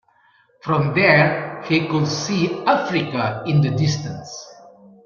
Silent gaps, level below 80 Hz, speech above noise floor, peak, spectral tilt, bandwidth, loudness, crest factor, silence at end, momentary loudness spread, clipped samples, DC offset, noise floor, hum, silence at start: none; -56 dBFS; 38 dB; -2 dBFS; -5.5 dB/octave; 7.2 kHz; -19 LUFS; 18 dB; 0.35 s; 16 LU; under 0.1%; under 0.1%; -57 dBFS; none; 0.65 s